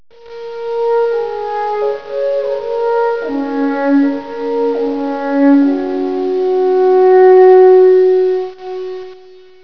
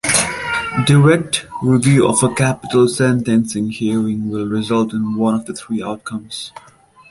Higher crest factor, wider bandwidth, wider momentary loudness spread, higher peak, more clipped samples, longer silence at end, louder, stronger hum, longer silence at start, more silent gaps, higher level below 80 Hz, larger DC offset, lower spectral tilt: about the same, 12 dB vs 16 dB; second, 5.4 kHz vs 12 kHz; first, 16 LU vs 12 LU; about the same, 0 dBFS vs 0 dBFS; neither; about the same, 0.45 s vs 0.5 s; first, -12 LUFS vs -16 LUFS; neither; first, 0.25 s vs 0.05 s; neither; second, -60 dBFS vs -48 dBFS; first, 1% vs under 0.1%; first, -6.5 dB/octave vs -5 dB/octave